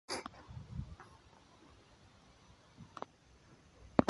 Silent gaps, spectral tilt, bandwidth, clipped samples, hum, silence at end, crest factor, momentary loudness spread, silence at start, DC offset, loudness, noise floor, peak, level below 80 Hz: none; -6 dB/octave; 11.5 kHz; under 0.1%; none; 0.05 s; 36 dB; 19 LU; 0.1 s; under 0.1%; -45 LUFS; -64 dBFS; -8 dBFS; -60 dBFS